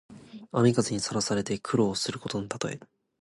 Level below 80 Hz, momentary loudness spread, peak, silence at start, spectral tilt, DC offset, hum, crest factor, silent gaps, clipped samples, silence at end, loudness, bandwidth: -60 dBFS; 14 LU; -10 dBFS; 0.1 s; -5 dB/octave; under 0.1%; none; 18 dB; none; under 0.1%; 0.4 s; -28 LUFS; 11.5 kHz